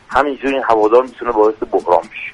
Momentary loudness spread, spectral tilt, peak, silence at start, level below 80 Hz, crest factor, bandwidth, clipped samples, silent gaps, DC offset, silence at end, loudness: 6 LU; -5.5 dB/octave; 0 dBFS; 0.1 s; -46 dBFS; 14 dB; 10.5 kHz; under 0.1%; none; under 0.1%; 0 s; -15 LUFS